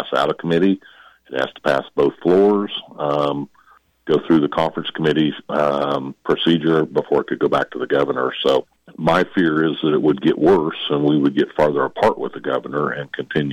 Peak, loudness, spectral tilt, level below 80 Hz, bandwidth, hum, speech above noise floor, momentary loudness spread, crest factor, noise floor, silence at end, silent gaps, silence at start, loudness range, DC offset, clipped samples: -6 dBFS; -19 LUFS; -7 dB/octave; -54 dBFS; 10.5 kHz; none; 35 dB; 8 LU; 12 dB; -54 dBFS; 0 s; none; 0 s; 3 LU; under 0.1%; under 0.1%